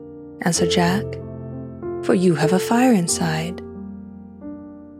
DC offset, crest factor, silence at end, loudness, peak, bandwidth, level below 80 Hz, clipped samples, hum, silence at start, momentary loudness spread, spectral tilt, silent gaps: under 0.1%; 18 dB; 0 s; -19 LUFS; -4 dBFS; 16 kHz; -50 dBFS; under 0.1%; none; 0 s; 20 LU; -5 dB/octave; none